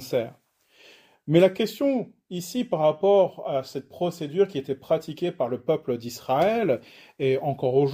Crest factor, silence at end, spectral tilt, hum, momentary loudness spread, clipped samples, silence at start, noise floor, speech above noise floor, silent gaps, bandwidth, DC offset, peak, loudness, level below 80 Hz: 20 dB; 0 s; -6.5 dB/octave; none; 11 LU; under 0.1%; 0 s; -56 dBFS; 32 dB; none; 16 kHz; under 0.1%; -6 dBFS; -25 LUFS; -68 dBFS